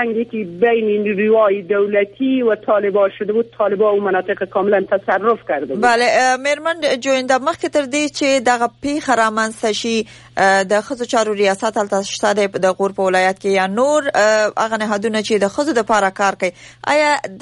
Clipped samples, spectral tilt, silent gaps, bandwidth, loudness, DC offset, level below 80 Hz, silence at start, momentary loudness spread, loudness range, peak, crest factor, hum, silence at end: under 0.1%; -3.5 dB/octave; none; 11.5 kHz; -16 LUFS; under 0.1%; -58 dBFS; 0 s; 5 LU; 1 LU; -2 dBFS; 14 dB; none; 0 s